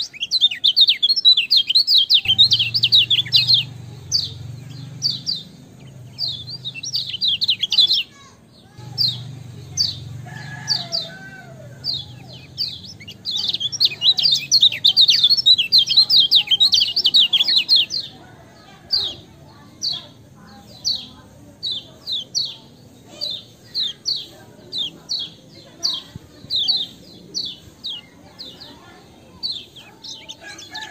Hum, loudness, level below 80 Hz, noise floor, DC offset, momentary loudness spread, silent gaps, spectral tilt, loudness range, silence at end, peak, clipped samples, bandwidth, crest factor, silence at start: none; -15 LUFS; -60 dBFS; -47 dBFS; under 0.1%; 22 LU; none; -0.5 dB/octave; 14 LU; 0 s; -2 dBFS; under 0.1%; 16 kHz; 20 dB; 0 s